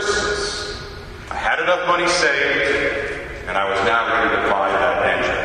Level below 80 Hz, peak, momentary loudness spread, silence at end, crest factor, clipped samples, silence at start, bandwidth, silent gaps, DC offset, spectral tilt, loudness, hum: -40 dBFS; -4 dBFS; 12 LU; 0 s; 16 dB; under 0.1%; 0 s; 12.5 kHz; none; under 0.1%; -3 dB/octave; -18 LUFS; none